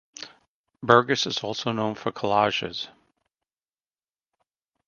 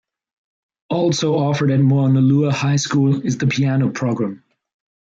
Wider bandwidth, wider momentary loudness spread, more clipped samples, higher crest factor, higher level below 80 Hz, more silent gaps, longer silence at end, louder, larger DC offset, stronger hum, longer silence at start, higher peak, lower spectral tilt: about the same, 7.2 kHz vs 7.8 kHz; first, 20 LU vs 6 LU; neither; first, 28 dB vs 12 dB; second, -66 dBFS vs -60 dBFS; first, 0.48-0.64 s vs none; first, 2 s vs 0.7 s; second, -24 LUFS vs -17 LUFS; neither; neither; second, 0.2 s vs 0.9 s; first, 0 dBFS vs -6 dBFS; second, -4 dB/octave vs -6.5 dB/octave